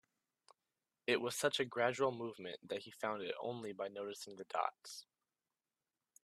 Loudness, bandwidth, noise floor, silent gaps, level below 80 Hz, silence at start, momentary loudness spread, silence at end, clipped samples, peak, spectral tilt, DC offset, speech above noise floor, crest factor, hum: -40 LUFS; 14 kHz; under -90 dBFS; none; -86 dBFS; 1.1 s; 13 LU; 1.2 s; under 0.1%; -18 dBFS; -3.5 dB/octave; under 0.1%; over 49 dB; 24 dB; none